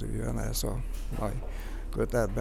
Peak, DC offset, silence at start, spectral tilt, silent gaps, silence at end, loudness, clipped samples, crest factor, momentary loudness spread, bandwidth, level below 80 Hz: -14 dBFS; under 0.1%; 0 s; -5.5 dB/octave; none; 0 s; -34 LUFS; under 0.1%; 16 dB; 10 LU; 15.5 kHz; -34 dBFS